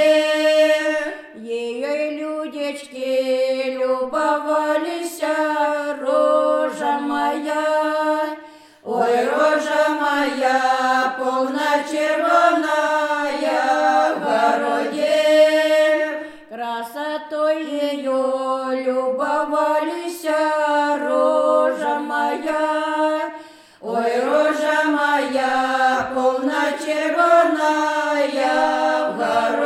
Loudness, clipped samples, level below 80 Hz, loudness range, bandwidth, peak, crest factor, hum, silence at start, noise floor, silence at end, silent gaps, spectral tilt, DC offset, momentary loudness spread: -19 LUFS; under 0.1%; -66 dBFS; 4 LU; 14 kHz; -2 dBFS; 16 dB; none; 0 s; -42 dBFS; 0 s; none; -3 dB/octave; under 0.1%; 10 LU